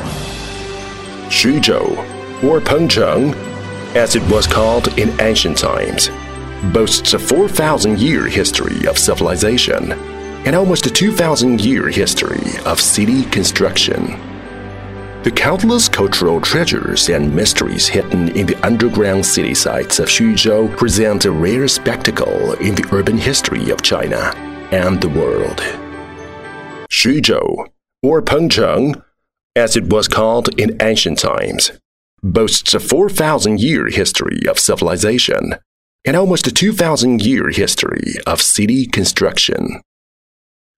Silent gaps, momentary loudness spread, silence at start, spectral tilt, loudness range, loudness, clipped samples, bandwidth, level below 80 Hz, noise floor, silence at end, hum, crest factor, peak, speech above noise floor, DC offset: 29.43-29.50 s, 31.85-32.17 s, 35.66-35.99 s; 13 LU; 0 s; -3.5 dB/octave; 2 LU; -13 LUFS; under 0.1%; 16 kHz; -34 dBFS; under -90 dBFS; 1 s; none; 14 dB; 0 dBFS; over 76 dB; under 0.1%